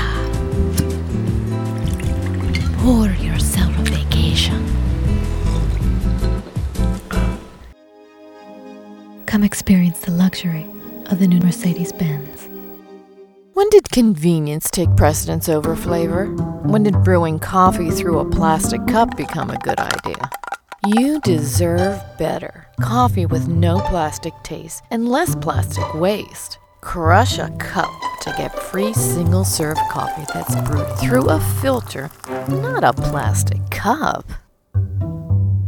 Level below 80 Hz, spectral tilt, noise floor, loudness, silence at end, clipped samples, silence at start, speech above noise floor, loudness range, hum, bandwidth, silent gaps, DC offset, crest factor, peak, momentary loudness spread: -28 dBFS; -6 dB/octave; -45 dBFS; -18 LUFS; 0 s; under 0.1%; 0 s; 28 dB; 5 LU; none; 19 kHz; none; under 0.1%; 18 dB; 0 dBFS; 13 LU